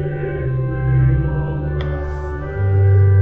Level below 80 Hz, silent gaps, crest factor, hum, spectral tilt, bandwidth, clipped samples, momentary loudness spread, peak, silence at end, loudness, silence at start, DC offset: -26 dBFS; none; 10 dB; none; -11 dB/octave; 3.7 kHz; under 0.1%; 11 LU; -6 dBFS; 0 s; -18 LUFS; 0 s; 1%